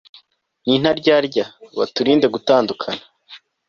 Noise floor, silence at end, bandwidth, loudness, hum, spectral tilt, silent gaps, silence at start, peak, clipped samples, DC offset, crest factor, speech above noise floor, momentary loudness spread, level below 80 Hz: -56 dBFS; 0.3 s; 7.2 kHz; -18 LUFS; none; -5.5 dB/octave; none; 0.65 s; -2 dBFS; under 0.1%; under 0.1%; 16 dB; 38 dB; 12 LU; -58 dBFS